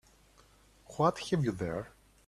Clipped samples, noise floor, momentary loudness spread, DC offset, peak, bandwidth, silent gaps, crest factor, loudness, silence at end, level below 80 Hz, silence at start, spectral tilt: under 0.1%; -62 dBFS; 17 LU; under 0.1%; -12 dBFS; 13.5 kHz; none; 22 dB; -33 LUFS; 0.4 s; -60 dBFS; 0.9 s; -6.5 dB/octave